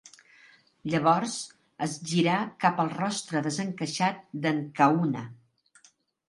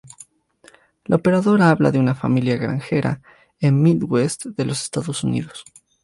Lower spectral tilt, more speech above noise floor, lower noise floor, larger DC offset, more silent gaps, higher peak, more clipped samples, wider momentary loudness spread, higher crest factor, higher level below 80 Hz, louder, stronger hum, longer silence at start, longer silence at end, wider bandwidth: second, -5 dB/octave vs -6.5 dB/octave; about the same, 36 dB vs 35 dB; first, -63 dBFS vs -53 dBFS; neither; neither; second, -8 dBFS vs -2 dBFS; neither; about the same, 11 LU vs 11 LU; about the same, 22 dB vs 18 dB; second, -72 dBFS vs -54 dBFS; second, -27 LUFS vs -19 LUFS; neither; second, 0.05 s vs 1.1 s; first, 0.95 s vs 0.4 s; about the same, 11.5 kHz vs 11.5 kHz